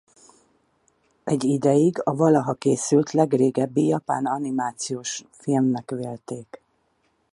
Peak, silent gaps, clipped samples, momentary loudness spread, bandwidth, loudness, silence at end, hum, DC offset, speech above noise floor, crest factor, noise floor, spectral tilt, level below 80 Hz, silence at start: -6 dBFS; none; under 0.1%; 12 LU; 11.5 kHz; -22 LUFS; 0.75 s; none; under 0.1%; 46 dB; 18 dB; -68 dBFS; -6 dB/octave; -68 dBFS; 1.25 s